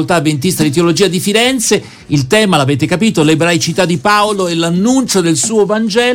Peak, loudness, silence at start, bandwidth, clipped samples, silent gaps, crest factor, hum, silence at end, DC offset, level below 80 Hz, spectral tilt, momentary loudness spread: 0 dBFS; -11 LUFS; 0 s; 17.5 kHz; under 0.1%; none; 12 dB; none; 0 s; under 0.1%; -46 dBFS; -4.5 dB/octave; 3 LU